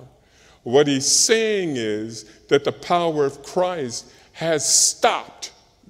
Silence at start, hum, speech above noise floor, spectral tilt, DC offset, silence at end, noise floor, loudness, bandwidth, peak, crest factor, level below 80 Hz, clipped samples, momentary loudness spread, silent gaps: 0 s; none; 33 dB; -2 dB/octave; under 0.1%; 0.4 s; -53 dBFS; -19 LUFS; 16 kHz; -2 dBFS; 20 dB; -62 dBFS; under 0.1%; 19 LU; none